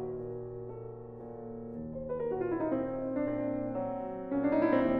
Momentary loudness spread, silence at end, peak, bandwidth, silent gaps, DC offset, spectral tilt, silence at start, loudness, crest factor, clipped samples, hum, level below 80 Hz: 15 LU; 0 s; -16 dBFS; 4.8 kHz; none; under 0.1%; -10.5 dB/octave; 0 s; -35 LUFS; 18 dB; under 0.1%; none; -58 dBFS